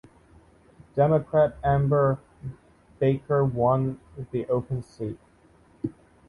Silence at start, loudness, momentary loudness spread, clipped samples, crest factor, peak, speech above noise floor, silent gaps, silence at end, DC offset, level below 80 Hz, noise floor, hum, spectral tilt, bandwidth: 0.95 s; -25 LUFS; 15 LU; under 0.1%; 18 dB; -8 dBFS; 34 dB; none; 0.4 s; under 0.1%; -50 dBFS; -58 dBFS; none; -10 dB/octave; 4.8 kHz